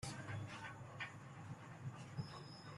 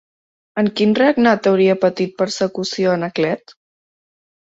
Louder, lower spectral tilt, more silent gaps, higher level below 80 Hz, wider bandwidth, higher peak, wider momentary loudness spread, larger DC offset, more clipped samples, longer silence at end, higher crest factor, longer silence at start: second, -51 LUFS vs -17 LUFS; about the same, -5 dB/octave vs -5.5 dB/octave; neither; second, -74 dBFS vs -60 dBFS; first, 12.5 kHz vs 8 kHz; second, -34 dBFS vs -2 dBFS; about the same, 5 LU vs 7 LU; neither; neither; second, 0 s vs 1.05 s; about the same, 18 dB vs 16 dB; second, 0 s vs 0.55 s